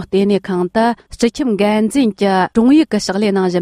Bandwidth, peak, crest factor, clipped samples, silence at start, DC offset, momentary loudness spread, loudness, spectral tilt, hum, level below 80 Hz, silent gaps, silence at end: 14.5 kHz; 0 dBFS; 14 dB; under 0.1%; 0 s; under 0.1%; 6 LU; -15 LUFS; -6 dB/octave; none; -46 dBFS; none; 0 s